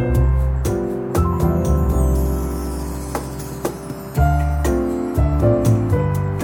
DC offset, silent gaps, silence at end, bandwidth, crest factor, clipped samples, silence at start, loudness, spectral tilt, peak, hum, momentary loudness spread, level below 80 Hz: under 0.1%; none; 0 s; 18 kHz; 14 dB; under 0.1%; 0 s; -20 LUFS; -7.5 dB/octave; -4 dBFS; none; 10 LU; -22 dBFS